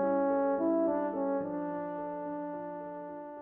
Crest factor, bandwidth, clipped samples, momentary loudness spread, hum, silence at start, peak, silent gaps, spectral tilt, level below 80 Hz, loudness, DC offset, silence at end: 14 dB; 3.2 kHz; under 0.1%; 12 LU; none; 0 s; -18 dBFS; none; -11 dB/octave; -72 dBFS; -33 LUFS; under 0.1%; 0 s